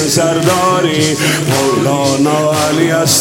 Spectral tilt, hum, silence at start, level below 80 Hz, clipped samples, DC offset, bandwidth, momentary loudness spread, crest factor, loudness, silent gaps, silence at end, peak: -4 dB/octave; none; 0 s; -50 dBFS; under 0.1%; 0.1%; 17 kHz; 1 LU; 12 dB; -12 LUFS; none; 0 s; 0 dBFS